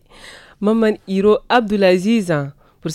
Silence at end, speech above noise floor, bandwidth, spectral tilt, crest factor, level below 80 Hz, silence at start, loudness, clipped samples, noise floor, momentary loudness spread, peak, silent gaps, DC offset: 0 s; 26 dB; 13 kHz; -6 dB/octave; 14 dB; -50 dBFS; 0.25 s; -16 LUFS; under 0.1%; -41 dBFS; 8 LU; -2 dBFS; none; under 0.1%